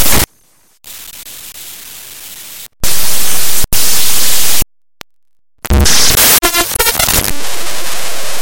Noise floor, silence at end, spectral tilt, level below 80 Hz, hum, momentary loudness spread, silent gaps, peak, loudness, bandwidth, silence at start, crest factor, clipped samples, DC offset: -67 dBFS; 0 s; -1.5 dB/octave; -24 dBFS; none; 21 LU; none; 0 dBFS; -11 LUFS; over 20 kHz; 0 s; 12 dB; 0.7%; under 0.1%